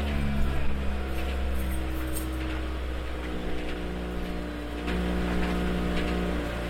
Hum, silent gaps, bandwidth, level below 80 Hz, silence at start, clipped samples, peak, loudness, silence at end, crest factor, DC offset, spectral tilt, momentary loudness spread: none; none; 16.5 kHz; -32 dBFS; 0 s; under 0.1%; -14 dBFS; -31 LUFS; 0 s; 14 dB; under 0.1%; -6 dB/octave; 5 LU